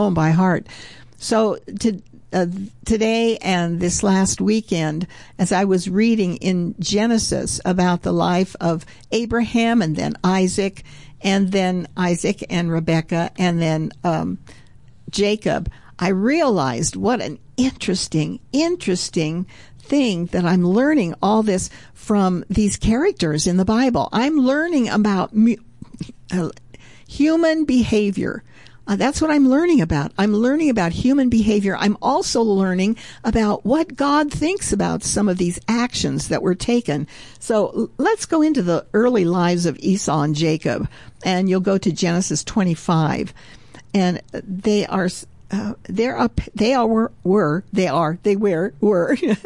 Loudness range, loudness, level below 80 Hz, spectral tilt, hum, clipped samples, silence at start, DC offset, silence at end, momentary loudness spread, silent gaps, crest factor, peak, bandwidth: 3 LU; -19 LUFS; -42 dBFS; -5.5 dB/octave; none; under 0.1%; 0 s; 0.4%; 0.05 s; 8 LU; none; 12 dB; -8 dBFS; 11.5 kHz